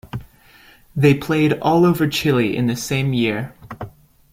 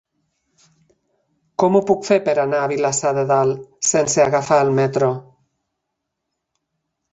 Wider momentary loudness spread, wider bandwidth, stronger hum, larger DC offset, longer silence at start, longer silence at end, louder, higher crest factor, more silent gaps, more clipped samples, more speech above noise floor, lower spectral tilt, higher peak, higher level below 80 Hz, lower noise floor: first, 19 LU vs 5 LU; first, 16.5 kHz vs 8.2 kHz; neither; neither; second, 0.05 s vs 1.6 s; second, 0.45 s vs 1.9 s; about the same, -18 LUFS vs -17 LUFS; about the same, 18 dB vs 18 dB; neither; neither; second, 31 dB vs 61 dB; first, -6 dB/octave vs -4.5 dB/octave; about the same, -2 dBFS vs -2 dBFS; first, -48 dBFS vs -60 dBFS; second, -49 dBFS vs -78 dBFS